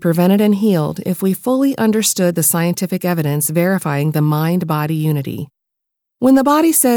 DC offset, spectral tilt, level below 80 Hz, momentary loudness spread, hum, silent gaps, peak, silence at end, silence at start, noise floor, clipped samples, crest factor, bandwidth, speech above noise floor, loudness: under 0.1%; -5.5 dB/octave; -60 dBFS; 7 LU; none; none; -2 dBFS; 0 s; 0 s; -78 dBFS; under 0.1%; 12 dB; over 20 kHz; 64 dB; -15 LUFS